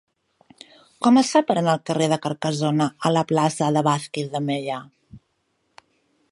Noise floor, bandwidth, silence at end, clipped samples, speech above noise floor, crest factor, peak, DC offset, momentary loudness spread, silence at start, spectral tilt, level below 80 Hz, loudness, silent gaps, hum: -71 dBFS; 11.5 kHz; 1.15 s; under 0.1%; 50 dB; 18 dB; -4 dBFS; under 0.1%; 9 LU; 1 s; -5.5 dB/octave; -66 dBFS; -21 LUFS; none; none